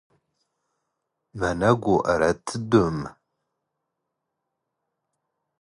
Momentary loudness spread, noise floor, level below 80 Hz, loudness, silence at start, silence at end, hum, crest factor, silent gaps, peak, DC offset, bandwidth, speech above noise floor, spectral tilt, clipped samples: 9 LU; -81 dBFS; -50 dBFS; -23 LUFS; 1.35 s; 2.5 s; none; 22 dB; none; -4 dBFS; under 0.1%; 11 kHz; 59 dB; -6.5 dB/octave; under 0.1%